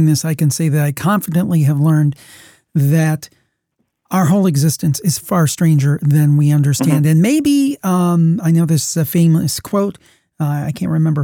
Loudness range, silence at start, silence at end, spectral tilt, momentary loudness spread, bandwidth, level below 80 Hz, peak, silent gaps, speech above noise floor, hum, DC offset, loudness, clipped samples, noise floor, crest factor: 3 LU; 0 s; 0 s; -6.5 dB/octave; 7 LU; 18 kHz; -54 dBFS; -2 dBFS; none; 55 dB; none; under 0.1%; -15 LUFS; under 0.1%; -69 dBFS; 12 dB